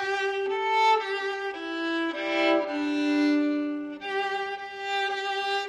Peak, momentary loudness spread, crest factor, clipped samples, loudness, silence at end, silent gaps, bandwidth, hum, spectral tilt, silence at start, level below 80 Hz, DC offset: -12 dBFS; 9 LU; 16 dB; under 0.1%; -27 LUFS; 0 s; none; 11.5 kHz; none; -2.5 dB/octave; 0 s; -72 dBFS; under 0.1%